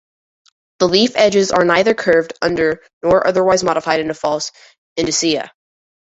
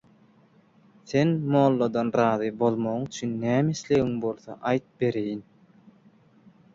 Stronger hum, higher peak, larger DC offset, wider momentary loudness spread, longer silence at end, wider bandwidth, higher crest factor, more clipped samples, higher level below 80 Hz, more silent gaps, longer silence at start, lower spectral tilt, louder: neither; first, 0 dBFS vs -8 dBFS; neither; about the same, 9 LU vs 9 LU; second, 0.55 s vs 1.35 s; about the same, 8.4 kHz vs 7.8 kHz; about the same, 16 dB vs 18 dB; neither; first, -50 dBFS vs -62 dBFS; first, 2.93-3.01 s, 4.78-4.96 s vs none; second, 0.8 s vs 1.05 s; second, -3.5 dB/octave vs -7 dB/octave; first, -15 LUFS vs -25 LUFS